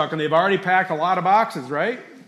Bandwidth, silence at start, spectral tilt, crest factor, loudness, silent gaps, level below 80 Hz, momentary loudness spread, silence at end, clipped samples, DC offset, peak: 13 kHz; 0 s; -6 dB/octave; 14 dB; -20 LUFS; none; -74 dBFS; 7 LU; 0.1 s; under 0.1%; under 0.1%; -6 dBFS